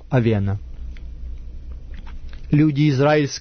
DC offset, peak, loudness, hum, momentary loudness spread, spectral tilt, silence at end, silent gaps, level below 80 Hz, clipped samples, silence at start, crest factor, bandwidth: under 0.1%; -4 dBFS; -19 LUFS; none; 22 LU; -7 dB/octave; 0 s; none; -34 dBFS; under 0.1%; 0 s; 16 dB; 6.6 kHz